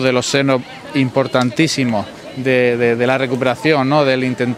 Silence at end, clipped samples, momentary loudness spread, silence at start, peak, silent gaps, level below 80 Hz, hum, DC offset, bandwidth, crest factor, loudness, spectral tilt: 0 s; under 0.1%; 6 LU; 0 s; 0 dBFS; none; -56 dBFS; none; under 0.1%; 14.5 kHz; 16 dB; -16 LUFS; -5 dB/octave